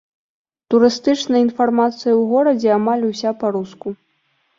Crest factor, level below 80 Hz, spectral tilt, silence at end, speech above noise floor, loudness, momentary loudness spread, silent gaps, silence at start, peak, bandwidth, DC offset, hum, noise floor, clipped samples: 16 dB; -62 dBFS; -5.5 dB/octave; 0.65 s; 48 dB; -17 LUFS; 12 LU; none; 0.7 s; -2 dBFS; 7.6 kHz; under 0.1%; none; -65 dBFS; under 0.1%